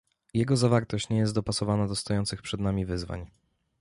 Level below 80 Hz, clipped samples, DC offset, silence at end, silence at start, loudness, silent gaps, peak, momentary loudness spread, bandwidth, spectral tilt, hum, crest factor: -48 dBFS; under 0.1%; under 0.1%; 0.55 s; 0.35 s; -28 LUFS; none; -10 dBFS; 9 LU; 11.5 kHz; -6 dB/octave; none; 18 dB